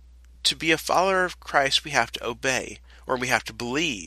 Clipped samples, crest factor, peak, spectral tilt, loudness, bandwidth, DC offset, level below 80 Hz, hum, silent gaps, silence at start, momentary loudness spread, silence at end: under 0.1%; 22 dB; -4 dBFS; -2.5 dB/octave; -24 LUFS; 13.5 kHz; under 0.1%; -50 dBFS; none; none; 0.45 s; 8 LU; 0 s